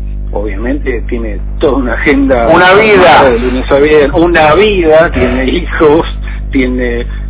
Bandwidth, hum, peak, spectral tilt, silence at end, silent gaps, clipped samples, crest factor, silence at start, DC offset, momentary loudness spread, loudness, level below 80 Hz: 4 kHz; 50 Hz at -20 dBFS; 0 dBFS; -9.5 dB/octave; 0 s; none; 3%; 8 dB; 0 s; under 0.1%; 14 LU; -8 LUFS; -18 dBFS